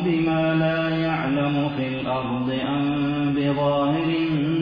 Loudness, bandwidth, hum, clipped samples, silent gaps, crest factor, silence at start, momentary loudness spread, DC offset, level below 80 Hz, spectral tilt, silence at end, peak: -23 LUFS; 5.2 kHz; none; under 0.1%; none; 12 dB; 0 s; 4 LU; under 0.1%; -50 dBFS; -9.5 dB/octave; 0 s; -10 dBFS